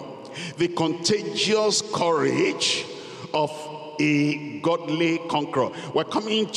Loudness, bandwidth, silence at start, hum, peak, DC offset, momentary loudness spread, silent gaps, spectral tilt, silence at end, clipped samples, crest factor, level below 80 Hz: -23 LUFS; 12 kHz; 0 s; none; -10 dBFS; under 0.1%; 13 LU; none; -4 dB/octave; 0 s; under 0.1%; 14 dB; -70 dBFS